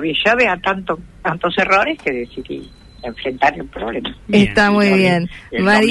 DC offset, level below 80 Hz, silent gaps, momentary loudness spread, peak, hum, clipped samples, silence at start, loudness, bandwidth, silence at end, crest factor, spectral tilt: under 0.1%; -42 dBFS; none; 15 LU; -2 dBFS; none; under 0.1%; 0 s; -16 LUFS; 11.5 kHz; 0 s; 14 dB; -5.5 dB/octave